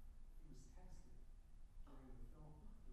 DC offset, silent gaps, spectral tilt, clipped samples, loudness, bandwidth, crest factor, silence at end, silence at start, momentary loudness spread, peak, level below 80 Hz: under 0.1%; none; -6.5 dB/octave; under 0.1%; -65 LUFS; 12.5 kHz; 12 dB; 0 s; 0 s; 5 LU; -46 dBFS; -58 dBFS